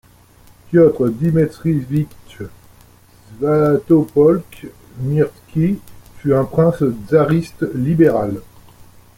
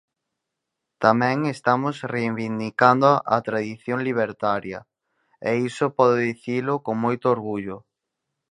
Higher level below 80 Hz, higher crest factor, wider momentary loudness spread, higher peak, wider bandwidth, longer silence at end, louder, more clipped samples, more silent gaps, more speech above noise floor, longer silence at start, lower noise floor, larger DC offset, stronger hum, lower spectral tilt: first, -46 dBFS vs -64 dBFS; second, 16 dB vs 22 dB; first, 17 LU vs 10 LU; about the same, -2 dBFS vs 0 dBFS; first, 16 kHz vs 11 kHz; second, 0.35 s vs 0.7 s; first, -16 LUFS vs -22 LUFS; neither; neither; second, 31 dB vs 60 dB; second, 0.7 s vs 1 s; second, -47 dBFS vs -82 dBFS; neither; first, 60 Hz at -50 dBFS vs none; first, -9.5 dB/octave vs -7 dB/octave